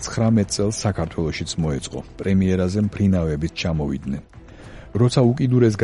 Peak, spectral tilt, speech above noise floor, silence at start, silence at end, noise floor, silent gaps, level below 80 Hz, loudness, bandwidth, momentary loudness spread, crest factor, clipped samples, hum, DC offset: -4 dBFS; -6.5 dB/octave; 20 dB; 0 s; 0 s; -40 dBFS; none; -38 dBFS; -21 LUFS; 11.5 kHz; 11 LU; 16 dB; under 0.1%; none; under 0.1%